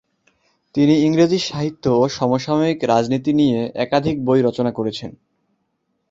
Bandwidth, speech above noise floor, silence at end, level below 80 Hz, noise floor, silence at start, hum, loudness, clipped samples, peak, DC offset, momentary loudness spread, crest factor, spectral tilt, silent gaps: 7.8 kHz; 53 dB; 1 s; -54 dBFS; -70 dBFS; 0.75 s; none; -18 LUFS; under 0.1%; -2 dBFS; under 0.1%; 9 LU; 16 dB; -6.5 dB/octave; none